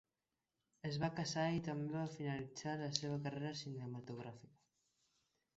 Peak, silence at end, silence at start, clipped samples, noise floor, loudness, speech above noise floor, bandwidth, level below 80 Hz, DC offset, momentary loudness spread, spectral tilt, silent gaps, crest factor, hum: -16 dBFS; 1.1 s; 0.85 s; under 0.1%; under -90 dBFS; -43 LUFS; over 47 dB; 8 kHz; -76 dBFS; under 0.1%; 10 LU; -5 dB/octave; none; 28 dB; none